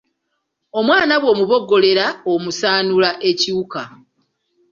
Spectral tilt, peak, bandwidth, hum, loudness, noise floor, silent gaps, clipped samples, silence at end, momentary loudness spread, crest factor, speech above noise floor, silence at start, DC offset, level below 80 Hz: -4 dB/octave; -2 dBFS; 7.6 kHz; none; -16 LUFS; -73 dBFS; none; under 0.1%; 0.85 s; 12 LU; 16 dB; 57 dB; 0.75 s; under 0.1%; -60 dBFS